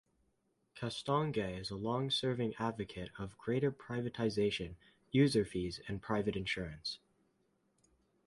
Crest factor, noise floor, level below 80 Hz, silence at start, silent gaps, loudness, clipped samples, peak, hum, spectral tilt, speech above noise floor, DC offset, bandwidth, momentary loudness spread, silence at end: 20 dB; -79 dBFS; -60 dBFS; 0.75 s; none; -37 LUFS; under 0.1%; -18 dBFS; none; -6 dB/octave; 42 dB; under 0.1%; 11.5 kHz; 12 LU; 1.3 s